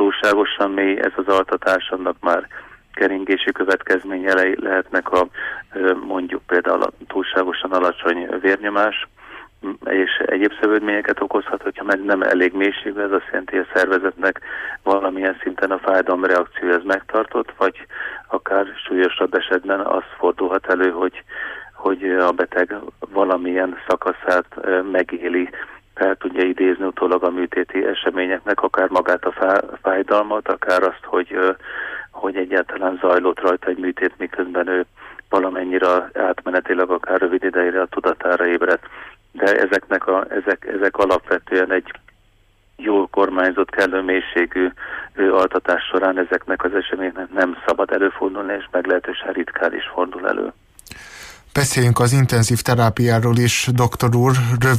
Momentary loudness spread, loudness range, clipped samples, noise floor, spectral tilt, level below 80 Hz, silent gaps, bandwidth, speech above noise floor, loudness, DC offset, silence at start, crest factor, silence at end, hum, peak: 9 LU; 2 LU; under 0.1%; -56 dBFS; -5.5 dB/octave; -52 dBFS; none; 15.5 kHz; 37 dB; -19 LUFS; under 0.1%; 0 s; 14 dB; 0 s; none; -4 dBFS